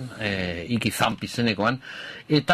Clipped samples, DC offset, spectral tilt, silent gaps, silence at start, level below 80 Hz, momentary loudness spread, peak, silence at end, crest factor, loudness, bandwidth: under 0.1%; under 0.1%; -5 dB/octave; none; 0 s; -50 dBFS; 9 LU; -4 dBFS; 0 s; 20 dB; -25 LUFS; 15.5 kHz